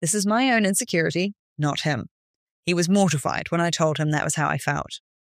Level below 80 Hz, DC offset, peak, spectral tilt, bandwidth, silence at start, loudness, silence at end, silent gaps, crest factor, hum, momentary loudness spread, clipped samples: -58 dBFS; under 0.1%; -6 dBFS; -4.5 dB/octave; 15.5 kHz; 0 s; -23 LUFS; 0.3 s; 1.39-1.56 s, 2.11-2.63 s; 16 dB; none; 10 LU; under 0.1%